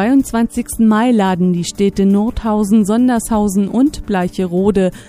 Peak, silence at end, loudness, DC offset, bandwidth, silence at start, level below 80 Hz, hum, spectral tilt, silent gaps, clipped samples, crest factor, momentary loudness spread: 0 dBFS; 0.05 s; -14 LUFS; under 0.1%; 15.5 kHz; 0 s; -34 dBFS; none; -6.5 dB/octave; none; under 0.1%; 14 dB; 5 LU